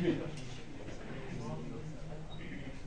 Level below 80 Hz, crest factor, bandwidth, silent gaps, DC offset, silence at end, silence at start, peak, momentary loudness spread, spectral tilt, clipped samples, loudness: -50 dBFS; 20 dB; 10 kHz; none; 0.5%; 0 s; 0 s; -22 dBFS; 7 LU; -6.5 dB/octave; under 0.1%; -44 LUFS